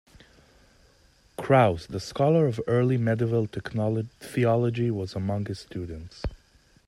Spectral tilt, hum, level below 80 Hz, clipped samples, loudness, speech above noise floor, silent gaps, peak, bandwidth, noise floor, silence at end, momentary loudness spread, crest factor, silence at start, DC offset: -7.5 dB/octave; none; -48 dBFS; under 0.1%; -26 LUFS; 35 dB; none; -6 dBFS; 12.5 kHz; -60 dBFS; 0.5 s; 16 LU; 20 dB; 1.4 s; under 0.1%